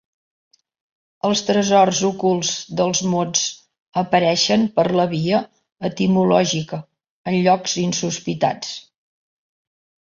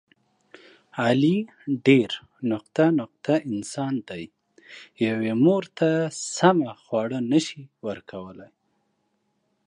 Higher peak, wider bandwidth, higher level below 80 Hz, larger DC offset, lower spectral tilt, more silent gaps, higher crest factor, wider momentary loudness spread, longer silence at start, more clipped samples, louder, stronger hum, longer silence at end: about the same, -2 dBFS vs -2 dBFS; second, 7.6 kHz vs 11 kHz; first, -60 dBFS vs -68 dBFS; neither; second, -4 dB/octave vs -6 dB/octave; first, 3.82-3.92 s, 7.10-7.24 s vs none; about the same, 18 dB vs 22 dB; second, 12 LU vs 17 LU; first, 1.25 s vs 0.95 s; neither; first, -19 LUFS vs -24 LUFS; neither; about the same, 1.3 s vs 1.2 s